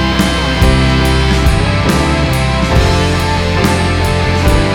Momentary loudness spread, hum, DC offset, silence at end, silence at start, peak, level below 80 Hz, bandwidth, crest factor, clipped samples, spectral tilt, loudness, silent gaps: 2 LU; none; under 0.1%; 0 s; 0 s; 0 dBFS; -16 dBFS; 18.5 kHz; 10 dB; under 0.1%; -5.5 dB/octave; -12 LUFS; none